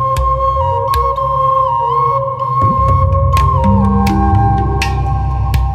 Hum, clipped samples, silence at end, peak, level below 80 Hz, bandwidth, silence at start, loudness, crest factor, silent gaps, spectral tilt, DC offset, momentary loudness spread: none; under 0.1%; 0 s; 0 dBFS; -20 dBFS; 15 kHz; 0 s; -13 LUFS; 12 dB; none; -7.5 dB/octave; under 0.1%; 4 LU